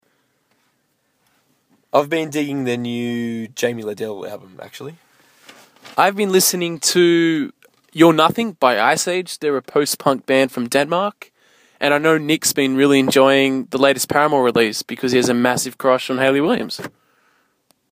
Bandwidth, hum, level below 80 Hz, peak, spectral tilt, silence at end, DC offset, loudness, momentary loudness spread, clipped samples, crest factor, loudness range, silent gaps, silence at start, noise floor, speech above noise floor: 15.5 kHz; none; -64 dBFS; 0 dBFS; -3.5 dB/octave; 1.05 s; under 0.1%; -17 LUFS; 14 LU; under 0.1%; 18 dB; 8 LU; none; 1.95 s; -66 dBFS; 49 dB